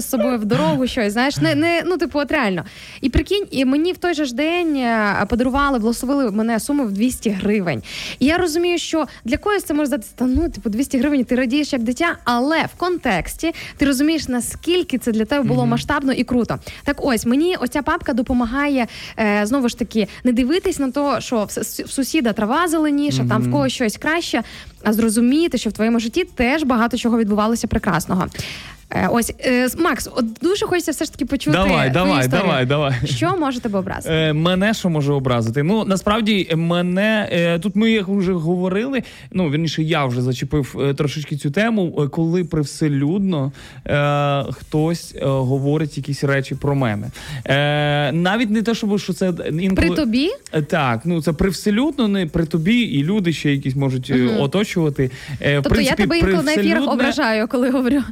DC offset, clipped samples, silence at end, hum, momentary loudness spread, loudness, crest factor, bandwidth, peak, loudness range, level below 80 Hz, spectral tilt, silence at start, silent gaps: under 0.1%; under 0.1%; 0 s; none; 6 LU; -19 LUFS; 12 dB; 16 kHz; -6 dBFS; 2 LU; -38 dBFS; -5.5 dB/octave; 0 s; none